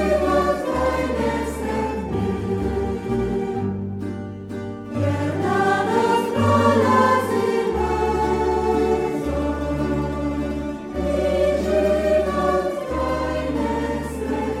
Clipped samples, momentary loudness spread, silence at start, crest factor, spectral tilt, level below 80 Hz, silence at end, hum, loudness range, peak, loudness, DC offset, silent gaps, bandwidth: under 0.1%; 8 LU; 0 s; 16 dB; -6.5 dB/octave; -34 dBFS; 0 s; none; 6 LU; -4 dBFS; -22 LUFS; under 0.1%; none; 16 kHz